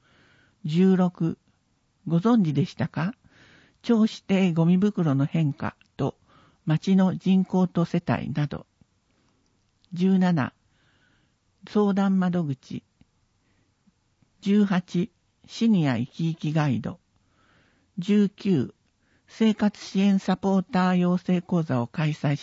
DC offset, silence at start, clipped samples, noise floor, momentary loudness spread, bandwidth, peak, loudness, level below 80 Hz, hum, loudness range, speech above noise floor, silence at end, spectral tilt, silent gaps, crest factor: under 0.1%; 0.65 s; under 0.1%; -69 dBFS; 13 LU; 7.6 kHz; -8 dBFS; -24 LUFS; -62 dBFS; none; 4 LU; 46 dB; 0 s; -8 dB/octave; none; 16 dB